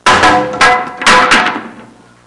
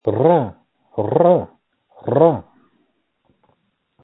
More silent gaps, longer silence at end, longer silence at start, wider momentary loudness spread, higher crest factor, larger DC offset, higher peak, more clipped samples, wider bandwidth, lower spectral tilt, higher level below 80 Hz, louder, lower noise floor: neither; second, 0.4 s vs 1.6 s; about the same, 0.05 s vs 0.05 s; second, 7 LU vs 16 LU; second, 10 dB vs 18 dB; neither; about the same, 0 dBFS vs 0 dBFS; neither; first, 11.5 kHz vs 4 kHz; second, -2 dB/octave vs -13 dB/octave; first, -40 dBFS vs -58 dBFS; first, -8 LUFS vs -17 LUFS; second, -37 dBFS vs -66 dBFS